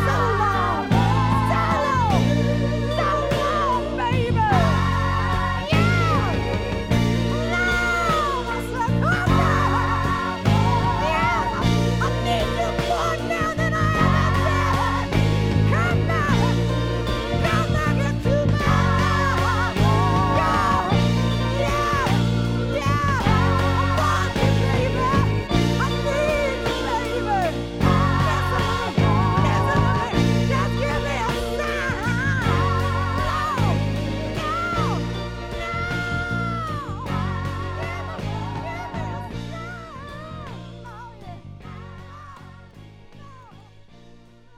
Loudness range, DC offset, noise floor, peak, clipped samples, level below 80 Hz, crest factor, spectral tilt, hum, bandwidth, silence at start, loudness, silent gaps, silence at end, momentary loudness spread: 9 LU; under 0.1%; -47 dBFS; -4 dBFS; under 0.1%; -32 dBFS; 16 dB; -6 dB/octave; none; 15 kHz; 0 s; -21 LUFS; none; 0.45 s; 10 LU